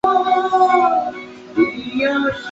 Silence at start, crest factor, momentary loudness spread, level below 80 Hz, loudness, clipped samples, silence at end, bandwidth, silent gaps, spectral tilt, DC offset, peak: 0.05 s; 14 dB; 11 LU; -54 dBFS; -17 LUFS; under 0.1%; 0 s; 7.8 kHz; none; -5 dB/octave; under 0.1%; -4 dBFS